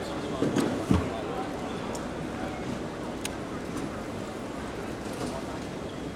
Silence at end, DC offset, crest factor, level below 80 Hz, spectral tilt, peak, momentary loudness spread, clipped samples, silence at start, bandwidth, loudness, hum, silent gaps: 0 s; under 0.1%; 24 dB; -48 dBFS; -5.5 dB/octave; -8 dBFS; 9 LU; under 0.1%; 0 s; 16 kHz; -33 LUFS; none; none